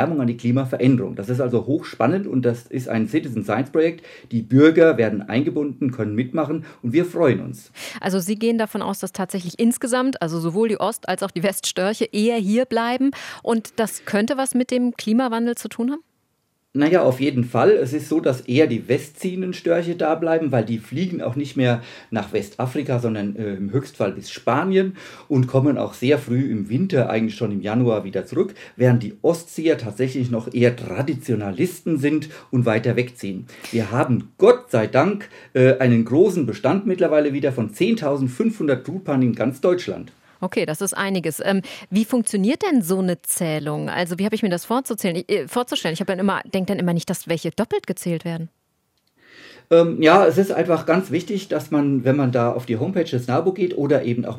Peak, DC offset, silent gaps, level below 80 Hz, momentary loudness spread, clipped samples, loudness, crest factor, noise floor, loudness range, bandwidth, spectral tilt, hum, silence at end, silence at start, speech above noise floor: 0 dBFS; under 0.1%; none; -68 dBFS; 9 LU; under 0.1%; -21 LUFS; 20 dB; -70 dBFS; 4 LU; 16.5 kHz; -6 dB/octave; none; 0 s; 0 s; 49 dB